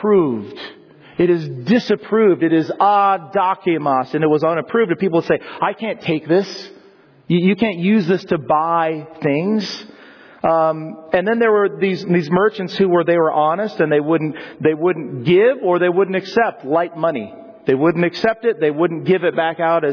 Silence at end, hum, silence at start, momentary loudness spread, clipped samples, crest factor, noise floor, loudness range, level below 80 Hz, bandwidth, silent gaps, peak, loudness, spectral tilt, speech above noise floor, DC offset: 0 s; none; 0 s; 7 LU; under 0.1%; 14 dB; -48 dBFS; 3 LU; -60 dBFS; 5.4 kHz; none; -4 dBFS; -17 LUFS; -7.5 dB/octave; 32 dB; under 0.1%